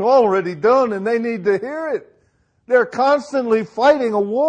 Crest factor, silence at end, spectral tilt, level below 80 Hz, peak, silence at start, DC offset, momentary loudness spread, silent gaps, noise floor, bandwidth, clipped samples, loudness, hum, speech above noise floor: 14 dB; 0 s; -6 dB/octave; -62 dBFS; -2 dBFS; 0 s; under 0.1%; 8 LU; none; -61 dBFS; 9.2 kHz; under 0.1%; -17 LUFS; none; 45 dB